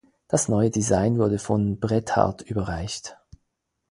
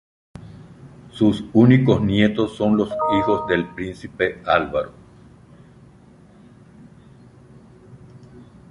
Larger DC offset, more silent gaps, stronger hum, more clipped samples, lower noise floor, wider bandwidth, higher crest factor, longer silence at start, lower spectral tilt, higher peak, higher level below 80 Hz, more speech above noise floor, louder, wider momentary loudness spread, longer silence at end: neither; neither; neither; neither; first, -77 dBFS vs -48 dBFS; about the same, 11.5 kHz vs 11 kHz; about the same, 22 dB vs 20 dB; second, 0.3 s vs 0.5 s; second, -5.5 dB/octave vs -8 dB/octave; about the same, -2 dBFS vs -2 dBFS; about the same, -46 dBFS vs -48 dBFS; first, 54 dB vs 30 dB; second, -24 LUFS vs -19 LUFS; second, 9 LU vs 19 LU; first, 0.75 s vs 0.3 s